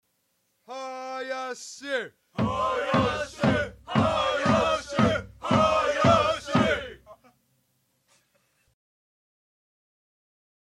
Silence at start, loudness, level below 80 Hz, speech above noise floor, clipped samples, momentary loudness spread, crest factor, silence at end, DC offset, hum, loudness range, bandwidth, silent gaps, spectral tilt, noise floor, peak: 0.7 s; -25 LUFS; -50 dBFS; 45 dB; under 0.1%; 14 LU; 22 dB; 3.55 s; under 0.1%; none; 7 LU; 12.5 kHz; none; -5.5 dB/octave; -73 dBFS; -6 dBFS